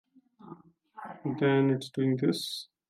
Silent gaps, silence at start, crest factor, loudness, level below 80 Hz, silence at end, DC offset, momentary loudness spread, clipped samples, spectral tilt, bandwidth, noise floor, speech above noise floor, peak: none; 0.45 s; 16 dB; -29 LUFS; -76 dBFS; 0.25 s; under 0.1%; 22 LU; under 0.1%; -6.5 dB/octave; 15 kHz; -52 dBFS; 24 dB; -14 dBFS